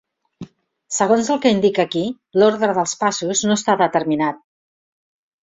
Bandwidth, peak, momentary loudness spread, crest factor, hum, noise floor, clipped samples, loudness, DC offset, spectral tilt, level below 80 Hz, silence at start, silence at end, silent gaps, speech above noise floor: 8 kHz; -2 dBFS; 7 LU; 18 dB; none; -41 dBFS; under 0.1%; -18 LUFS; under 0.1%; -4 dB/octave; -62 dBFS; 0.4 s; 1.05 s; none; 23 dB